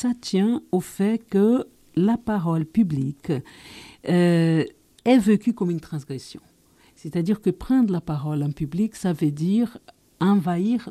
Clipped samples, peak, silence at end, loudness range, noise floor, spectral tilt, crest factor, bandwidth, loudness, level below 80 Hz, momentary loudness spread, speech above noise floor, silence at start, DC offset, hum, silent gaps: under 0.1%; -6 dBFS; 0 s; 3 LU; -57 dBFS; -7.5 dB/octave; 16 dB; 14 kHz; -23 LUFS; -54 dBFS; 13 LU; 35 dB; 0 s; under 0.1%; none; none